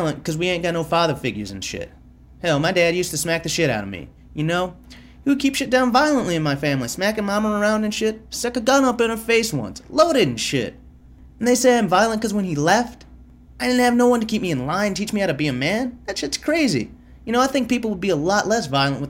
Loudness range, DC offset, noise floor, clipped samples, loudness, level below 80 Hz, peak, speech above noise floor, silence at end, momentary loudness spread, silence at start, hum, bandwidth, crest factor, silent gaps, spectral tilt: 3 LU; under 0.1%; -45 dBFS; under 0.1%; -20 LUFS; -46 dBFS; -4 dBFS; 25 dB; 0 s; 10 LU; 0 s; none; 16 kHz; 18 dB; none; -4.5 dB/octave